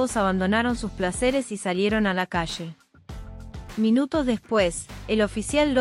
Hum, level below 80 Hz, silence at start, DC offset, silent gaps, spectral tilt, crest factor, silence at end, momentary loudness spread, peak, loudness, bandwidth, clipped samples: none; -42 dBFS; 0 s; under 0.1%; none; -5 dB/octave; 16 dB; 0 s; 18 LU; -8 dBFS; -24 LUFS; 13.5 kHz; under 0.1%